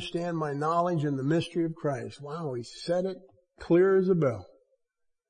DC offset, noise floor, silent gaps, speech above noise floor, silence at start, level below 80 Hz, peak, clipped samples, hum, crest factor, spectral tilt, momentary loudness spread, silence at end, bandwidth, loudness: under 0.1%; -78 dBFS; none; 51 dB; 0 s; -62 dBFS; -14 dBFS; under 0.1%; none; 14 dB; -7.5 dB/octave; 13 LU; 0.85 s; 10.5 kHz; -28 LUFS